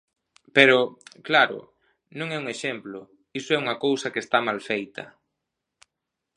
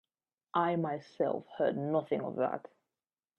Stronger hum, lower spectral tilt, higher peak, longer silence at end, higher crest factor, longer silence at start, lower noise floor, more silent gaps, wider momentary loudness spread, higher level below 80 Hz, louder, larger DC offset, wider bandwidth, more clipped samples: neither; second, -4 dB/octave vs -8.5 dB/octave; first, 0 dBFS vs -16 dBFS; first, 1.3 s vs 0.8 s; first, 26 dB vs 18 dB; about the same, 0.55 s vs 0.55 s; second, -84 dBFS vs under -90 dBFS; neither; first, 23 LU vs 5 LU; first, -74 dBFS vs -80 dBFS; first, -23 LUFS vs -34 LUFS; neither; first, 11 kHz vs 6.8 kHz; neither